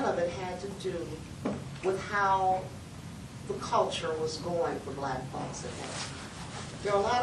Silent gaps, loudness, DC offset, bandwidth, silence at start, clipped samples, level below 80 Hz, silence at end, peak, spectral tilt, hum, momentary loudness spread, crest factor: none; -33 LUFS; under 0.1%; 12.5 kHz; 0 s; under 0.1%; -56 dBFS; 0 s; -14 dBFS; -4.5 dB/octave; none; 13 LU; 18 dB